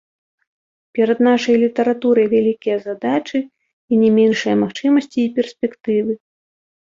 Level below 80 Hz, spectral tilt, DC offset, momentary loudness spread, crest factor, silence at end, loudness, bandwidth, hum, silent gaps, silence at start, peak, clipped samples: -62 dBFS; -6 dB/octave; under 0.1%; 10 LU; 14 dB; 0.7 s; -17 LUFS; 7.6 kHz; none; 3.73-3.88 s; 0.95 s; -4 dBFS; under 0.1%